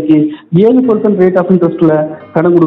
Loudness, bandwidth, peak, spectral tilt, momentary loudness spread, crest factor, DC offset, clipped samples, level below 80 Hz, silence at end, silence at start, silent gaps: -10 LUFS; 4.1 kHz; 0 dBFS; -11 dB/octave; 5 LU; 8 dB; under 0.1%; 2%; -52 dBFS; 0 s; 0 s; none